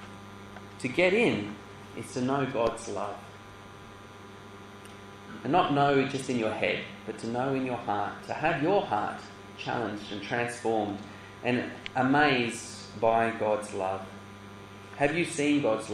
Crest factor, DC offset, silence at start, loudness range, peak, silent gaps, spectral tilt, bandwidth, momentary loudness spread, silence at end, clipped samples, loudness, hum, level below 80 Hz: 20 dB; under 0.1%; 0 s; 6 LU; -10 dBFS; none; -5 dB/octave; 12.5 kHz; 22 LU; 0 s; under 0.1%; -29 LUFS; none; -62 dBFS